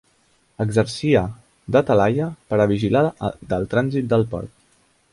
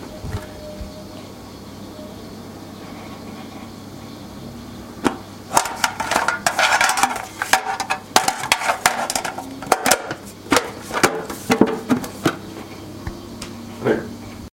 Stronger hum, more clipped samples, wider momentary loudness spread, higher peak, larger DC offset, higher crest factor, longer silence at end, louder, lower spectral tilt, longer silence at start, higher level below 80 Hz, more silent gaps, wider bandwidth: neither; neither; second, 11 LU vs 19 LU; second, -4 dBFS vs 0 dBFS; neither; second, 18 dB vs 24 dB; first, 0.65 s vs 0.05 s; about the same, -20 LUFS vs -20 LUFS; first, -7 dB/octave vs -2.5 dB/octave; first, 0.6 s vs 0 s; about the same, -46 dBFS vs -46 dBFS; neither; second, 11.5 kHz vs 17 kHz